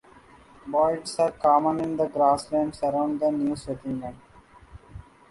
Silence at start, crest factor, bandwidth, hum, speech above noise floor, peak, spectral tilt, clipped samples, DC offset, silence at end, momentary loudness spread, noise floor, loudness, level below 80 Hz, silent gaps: 0.65 s; 18 dB; 11.5 kHz; none; 28 dB; -8 dBFS; -6 dB/octave; under 0.1%; under 0.1%; 0.3 s; 12 LU; -52 dBFS; -25 LUFS; -54 dBFS; none